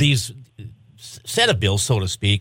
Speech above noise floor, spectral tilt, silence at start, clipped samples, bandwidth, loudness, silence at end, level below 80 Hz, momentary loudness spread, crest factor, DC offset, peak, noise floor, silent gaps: 21 dB; -4 dB/octave; 0 s; under 0.1%; 16.5 kHz; -19 LUFS; 0 s; -46 dBFS; 24 LU; 20 dB; under 0.1%; -2 dBFS; -40 dBFS; none